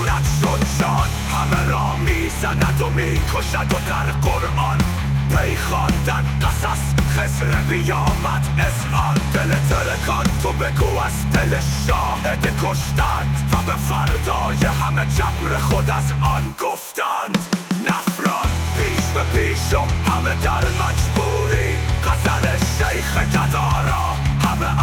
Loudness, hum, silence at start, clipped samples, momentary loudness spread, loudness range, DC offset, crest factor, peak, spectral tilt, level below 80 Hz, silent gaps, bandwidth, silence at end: -19 LUFS; none; 0 s; under 0.1%; 2 LU; 1 LU; under 0.1%; 14 dB; -4 dBFS; -5 dB/octave; -26 dBFS; none; 19 kHz; 0 s